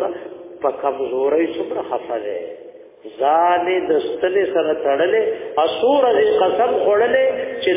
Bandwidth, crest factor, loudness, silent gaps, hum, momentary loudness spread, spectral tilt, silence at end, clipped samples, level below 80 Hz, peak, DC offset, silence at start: 3.8 kHz; 14 dB; -18 LUFS; none; none; 11 LU; -8 dB/octave; 0 s; under 0.1%; -60 dBFS; -4 dBFS; under 0.1%; 0 s